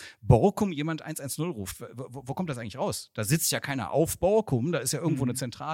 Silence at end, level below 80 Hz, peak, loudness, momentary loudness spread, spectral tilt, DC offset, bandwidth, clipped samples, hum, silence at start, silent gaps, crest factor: 0 s; -48 dBFS; -6 dBFS; -28 LUFS; 13 LU; -5 dB/octave; under 0.1%; 16.5 kHz; under 0.1%; none; 0 s; none; 22 dB